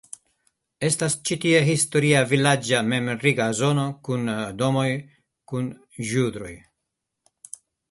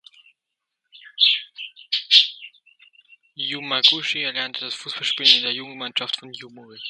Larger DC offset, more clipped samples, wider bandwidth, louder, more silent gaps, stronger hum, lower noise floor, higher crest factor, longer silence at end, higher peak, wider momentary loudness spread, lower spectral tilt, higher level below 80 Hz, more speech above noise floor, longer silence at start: neither; neither; about the same, 12 kHz vs 11.5 kHz; second, -22 LUFS vs -19 LUFS; neither; neither; about the same, -81 dBFS vs -82 dBFS; about the same, 20 dB vs 24 dB; first, 1.35 s vs 0 s; second, -4 dBFS vs 0 dBFS; about the same, 20 LU vs 22 LU; first, -4.5 dB/octave vs -1 dB/octave; first, -60 dBFS vs -82 dBFS; about the same, 59 dB vs 59 dB; second, 0.8 s vs 0.95 s